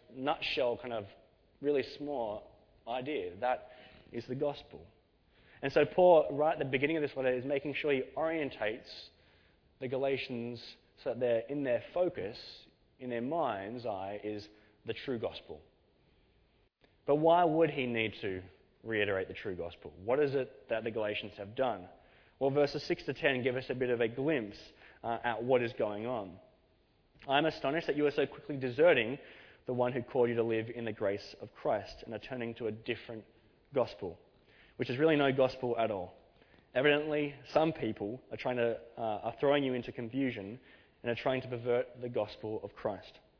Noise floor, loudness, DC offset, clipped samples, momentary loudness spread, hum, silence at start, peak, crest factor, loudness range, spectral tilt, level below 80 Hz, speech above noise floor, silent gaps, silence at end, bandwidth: -70 dBFS; -34 LUFS; under 0.1%; under 0.1%; 16 LU; none; 0.1 s; -12 dBFS; 22 dB; 8 LU; -4 dB/octave; -66 dBFS; 37 dB; none; 0.3 s; 5.4 kHz